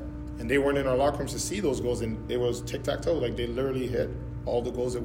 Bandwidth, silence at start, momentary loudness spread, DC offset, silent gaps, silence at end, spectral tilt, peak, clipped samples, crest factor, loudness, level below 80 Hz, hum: 16 kHz; 0 s; 7 LU; under 0.1%; none; 0 s; -5.5 dB/octave; -12 dBFS; under 0.1%; 16 dB; -29 LUFS; -42 dBFS; none